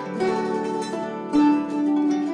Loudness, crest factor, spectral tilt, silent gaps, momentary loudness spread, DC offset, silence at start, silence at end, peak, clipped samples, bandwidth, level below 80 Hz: -23 LUFS; 14 dB; -6 dB/octave; none; 8 LU; under 0.1%; 0 s; 0 s; -8 dBFS; under 0.1%; 10 kHz; -62 dBFS